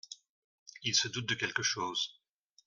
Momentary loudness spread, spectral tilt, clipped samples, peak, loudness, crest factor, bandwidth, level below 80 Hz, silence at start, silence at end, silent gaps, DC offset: 12 LU; -1.5 dB/octave; under 0.1%; -16 dBFS; -32 LUFS; 22 dB; 11.5 kHz; -74 dBFS; 0.1 s; 0.55 s; 0.29-0.66 s; under 0.1%